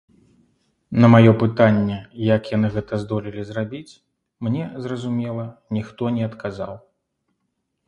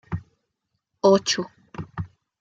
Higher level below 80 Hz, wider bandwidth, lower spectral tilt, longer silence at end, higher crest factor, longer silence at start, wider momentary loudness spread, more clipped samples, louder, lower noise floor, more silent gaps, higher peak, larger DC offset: about the same, -52 dBFS vs -54 dBFS; second, 7.8 kHz vs 9 kHz; first, -9 dB/octave vs -4.5 dB/octave; first, 1.1 s vs 0.35 s; about the same, 20 dB vs 22 dB; first, 0.9 s vs 0.1 s; about the same, 17 LU vs 19 LU; neither; about the same, -20 LUFS vs -21 LUFS; about the same, -75 dBFS vs -78 dBFS; neither; first, 0 dBFS vs -4 dBFS; neither